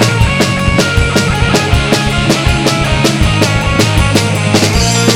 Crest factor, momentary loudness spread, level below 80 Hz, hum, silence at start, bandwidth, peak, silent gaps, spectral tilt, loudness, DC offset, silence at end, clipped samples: 10 dB; 1 LU; -20 dBFS; none; 0 s; 16.5 kHz; 0 dBFS; none; -4.5 dB/octave; -11 LUFS; under 0.1%; 0 s; 0.6%